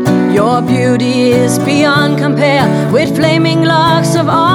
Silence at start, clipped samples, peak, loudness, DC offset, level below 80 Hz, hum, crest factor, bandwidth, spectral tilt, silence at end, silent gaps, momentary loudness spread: 0 s; under 0.1%; 0 dBFS; -10 LUFS; under 0.1%; -44 dBFS; none; 10 dB; 17.5 kHz; -6 dB/octave; 0 s; none; 2 LU